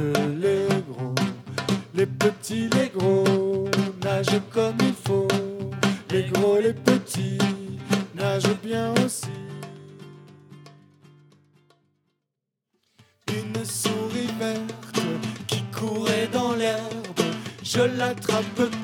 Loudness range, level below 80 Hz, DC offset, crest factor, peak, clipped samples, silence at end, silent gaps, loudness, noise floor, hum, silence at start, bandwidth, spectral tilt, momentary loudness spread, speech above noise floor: 9 LU; -70 dBFS; under 0.1%; 24 dB; -2 dBFS; under 0.1%; 0 s; none; -25 LUFS; -83 dBFS; none; 0 s; 18 kHz; -5 dB/octave; 9 LU; 61 dB